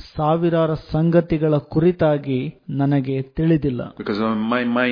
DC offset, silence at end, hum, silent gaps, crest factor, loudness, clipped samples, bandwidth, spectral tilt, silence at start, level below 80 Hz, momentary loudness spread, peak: under 0.1%; 0 s; none; none; 16 dB; -20 LUFS; under 0.1%; 5.2 kHz; -10 dB/octave; 0 s; -44 dBFS; 8 LU; -4 dBFS